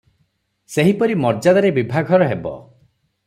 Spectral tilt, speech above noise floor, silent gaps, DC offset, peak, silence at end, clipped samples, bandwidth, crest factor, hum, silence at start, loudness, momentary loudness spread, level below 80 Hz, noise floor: -7 dB/octave; 50 dB; none; under 0.1%; -2 dBFS; 0.65 s; under 0.1%; 15 kHz; 16 dB; none; 0.7 s; -17 LUFS; 12 LU; -56 dBFS; -66 dBFS